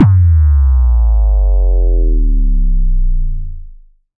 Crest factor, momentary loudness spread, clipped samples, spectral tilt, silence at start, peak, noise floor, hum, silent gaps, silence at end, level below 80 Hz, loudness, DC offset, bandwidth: 10 dB; 11 LU; under 0.1%; -12.5 dB/octave; 0 s; 0 dBFS; -37 dBFS; none; none; 0.45 s; -10 dBFS; -14 LUFS; under 0.1%; 2.1 kHz